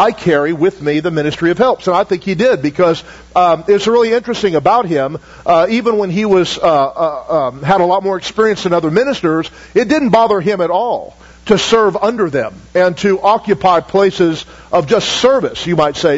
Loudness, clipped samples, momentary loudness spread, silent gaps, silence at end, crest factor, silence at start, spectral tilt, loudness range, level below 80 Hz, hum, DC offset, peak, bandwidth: -13 LUFS; under 0.1%; 5 LU; none; 0 s; 12 dB; 0 s; -5.5 dB/octave; 1 LU; -44 dBFS; none; under 0.1%; 0 dBFS; 8 kHz